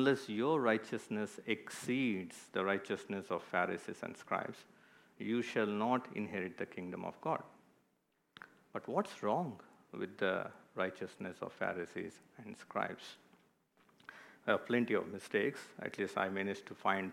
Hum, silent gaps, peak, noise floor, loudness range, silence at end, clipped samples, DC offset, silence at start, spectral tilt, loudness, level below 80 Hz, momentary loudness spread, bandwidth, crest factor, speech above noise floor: none; none; -16 dBFS; -79 dBFS; 5 LU; 0 s; under 0.1%; under 0.1%; 0 s; -5.5 dB/octave; -39 LUFS; -86 dBFS; 16 LU; 16 kHz; 22 dB; 41 dB